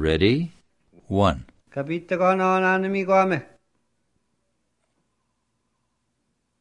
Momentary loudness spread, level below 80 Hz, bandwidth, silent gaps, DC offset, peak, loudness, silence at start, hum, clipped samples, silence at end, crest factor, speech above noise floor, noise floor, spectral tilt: 13 LU; -48 dBFS; 10 kHz; none; under 0.1%; -6 dBFS; -22 LUFS; 0 s; none; under 0.1%; 3.15 s; 18 dB; 53 dB; -74 dBFS; -7 dB/octave